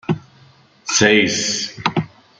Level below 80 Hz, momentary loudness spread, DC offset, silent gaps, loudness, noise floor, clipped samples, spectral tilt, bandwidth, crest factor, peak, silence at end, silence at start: -54 dBFS; 13 LU; under 0.1%; none; -17 LUFS; -50 dBFS; under 0.1%; -3 dB/octave; 10 kHz; 18 dB; -2 dBFS; 0.3 s; 0.1 s